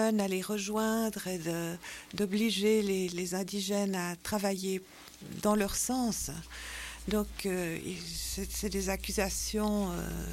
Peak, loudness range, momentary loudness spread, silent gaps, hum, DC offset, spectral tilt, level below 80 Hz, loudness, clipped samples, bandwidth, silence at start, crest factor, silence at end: -16 dBFS; 3 LU; 10 LU; none; none; under 0.1%; -4 dB/octave; -48 dBFS; -33 LUFS; under 0.1%; 16.5 kHz; 0 s; 16 dB; 0 s